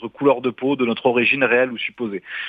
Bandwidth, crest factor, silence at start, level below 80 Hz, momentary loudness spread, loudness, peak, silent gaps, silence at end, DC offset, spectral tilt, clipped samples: 4.9 kHz; 16 dB; 0 s; -66 dBFS; 9 LU; -19 LUFS; -2 dBFS; none; 0 s; under 0.1%; -8 dB/octave; under 0.1%